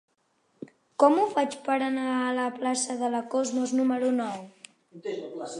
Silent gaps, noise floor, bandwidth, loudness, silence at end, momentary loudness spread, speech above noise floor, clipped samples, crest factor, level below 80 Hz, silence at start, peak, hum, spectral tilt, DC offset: none; -71 dBFS; 11 kHz; -27 LUFS; 0 s; 18 LU; 44 dB; under 0.1%; 22 dB; -82 dBFS; 0.6 s; -6 dBFS; none; -3.5 dB/octave; under 0.1%